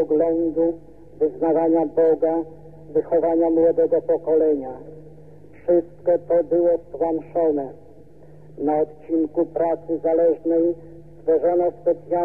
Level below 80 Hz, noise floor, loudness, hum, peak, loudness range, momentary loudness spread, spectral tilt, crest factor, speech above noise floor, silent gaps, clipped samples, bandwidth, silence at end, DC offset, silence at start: -56 dBFS; -47 dBFS; -21 LUFS; none; -8 dBFS; 3 LU; 9 LU; -11 dB/octave; 12 dB; 27 dB; none; under 0.1%; 2.6 kHz; 0 s; 0.5%; 0 s